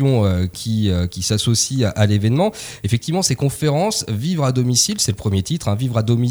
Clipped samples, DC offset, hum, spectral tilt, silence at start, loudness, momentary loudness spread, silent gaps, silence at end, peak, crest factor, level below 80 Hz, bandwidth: under 0.1%; under 0.1%; none; -5 dB/octave; 0 s; -18 LUFS; 5 LU; none; 0 s; -2 dBFS; 16 dB; -42 dBFS; over 20 kHz